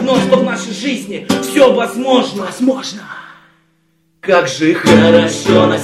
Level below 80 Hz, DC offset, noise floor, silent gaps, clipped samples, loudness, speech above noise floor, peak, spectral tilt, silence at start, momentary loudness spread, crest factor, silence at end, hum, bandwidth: -50 dBFS; under 0.1%; -58 dBFS; none; under 0.1%; -12 LUFS; 46 dB; 0 dBFS; -5 dB/octave; 0 s; 14 LU; 14 dB; 0 s; none; 14.5 kHz